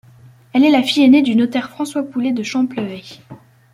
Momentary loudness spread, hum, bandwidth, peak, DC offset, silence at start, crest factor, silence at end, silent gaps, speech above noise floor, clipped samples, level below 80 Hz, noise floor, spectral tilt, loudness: 15 LU; none; 12.5 kHz; -2 dBFS; under 0.1%; 0.55 s; 14 dB; 0.4 s; none; 30 dB; under 0.1%; -60 dBFS; -45 dBFS; -5 dB/octave; -16 LUFS